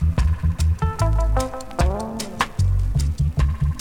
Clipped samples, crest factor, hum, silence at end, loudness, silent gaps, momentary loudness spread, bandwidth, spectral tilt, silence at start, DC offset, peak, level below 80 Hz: under 0.1%; 16 dB; none; 0 s; -22 LUFS; none; 4 LU; 15.5 kHz; -6 dB/octave; 0 s; under 0.1%; -4 dBFS; -22 dBFS